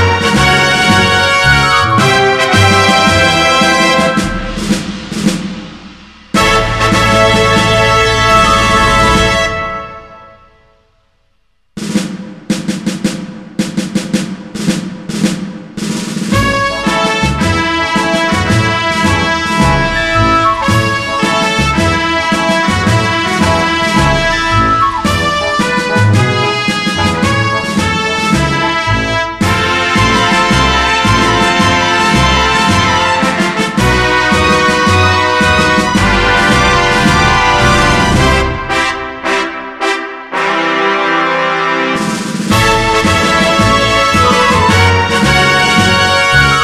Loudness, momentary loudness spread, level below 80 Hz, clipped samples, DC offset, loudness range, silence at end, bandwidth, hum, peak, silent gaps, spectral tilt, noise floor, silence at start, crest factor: -10 LUFS; 9 LU; -26 dBFS; under 0.1%; 0.3%; 8 LU; 0 s; 15.5 kHz; none; 0 dBFS; none; -4 dB/octave; -59 dBFS; 0 s; 10 dB